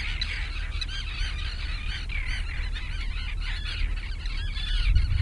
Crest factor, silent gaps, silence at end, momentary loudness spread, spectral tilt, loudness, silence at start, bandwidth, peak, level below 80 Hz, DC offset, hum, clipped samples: 18 dB; none; 0 s; 6 LU; -4 dB/octave; -32 LUFS; 0 s; 11 kHz; -10 dBFS; -28 dBFS; under 0.1%; none; under 0.1%